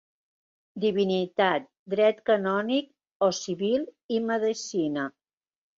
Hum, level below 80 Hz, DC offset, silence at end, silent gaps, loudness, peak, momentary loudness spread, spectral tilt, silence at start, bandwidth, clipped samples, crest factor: none; -72 dBFS; under 0.1%; 0.7 s; 1.79-1.86 s, 3.11-3.20 s, 4.04-4.09 s; -27 LUFS; -10 dBFS; 7 LU; -4.5 dB/octave; 0.75 s; 7.8 kHz; under 0.1%; 18 dB